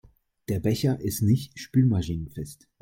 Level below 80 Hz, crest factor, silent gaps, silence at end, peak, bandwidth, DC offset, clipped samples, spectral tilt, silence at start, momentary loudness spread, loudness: -50 dBFS; 16 dB; none; 0.3 s; -10 dBFS; 16.5 kHz; under 0.1%; under 0.1%; -7 dB/octave; 0.5 s; 15 LU; -26 LUFS